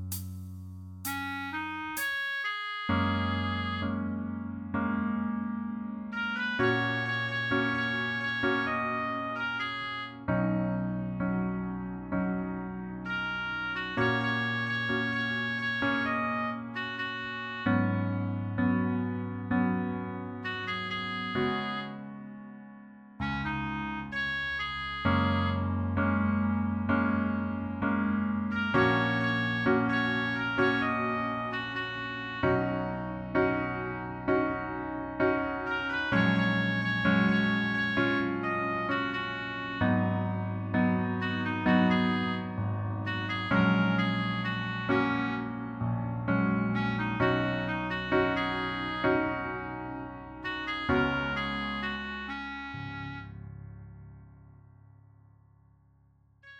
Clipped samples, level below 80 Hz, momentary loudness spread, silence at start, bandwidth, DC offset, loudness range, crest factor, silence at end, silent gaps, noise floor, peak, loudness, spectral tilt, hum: under 0.1%; -54 dBFS; 10 LU; 0 s; 15.5 kHz; under 0.1%; 5 LU; 18 dB; 0 s; none; -63 dBFS; -12 dBFS; -30 LUFS; -6.5 dB/octave; none